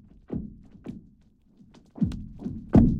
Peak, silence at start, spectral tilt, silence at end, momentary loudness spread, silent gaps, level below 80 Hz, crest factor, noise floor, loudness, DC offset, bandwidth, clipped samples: -6 dBFS; 0.3 s; -10.5 dB/octave; 0 s; 22 LU; none; -38 dBFS; 20 dB; -59 dBFS; -28 LUFS; under 0.1%; 6.6 kHz; under 0.1%